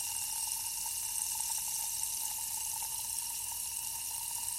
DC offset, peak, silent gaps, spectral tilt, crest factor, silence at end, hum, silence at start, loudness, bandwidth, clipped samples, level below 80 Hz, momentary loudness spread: under 0.1%; -18 dBFS; none; 2 dB/octave; 18 dB; 0 s; none; 0 s; -34 LUFS; 16.5 kHz; under 0.1%; -64 dBFS; 3 LU